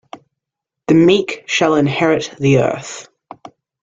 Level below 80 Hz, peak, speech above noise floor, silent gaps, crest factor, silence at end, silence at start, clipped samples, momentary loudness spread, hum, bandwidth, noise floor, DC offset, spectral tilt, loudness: -52 dBFS; -2 dBFS; 67 dB; none; 16 dB; 0.8 s; 0.15 s; under 0.1%; 17 LU; none; 7.8 kHz; -81 dBFS; under 0.1%; -5.5 dB/octave; -15 LUFS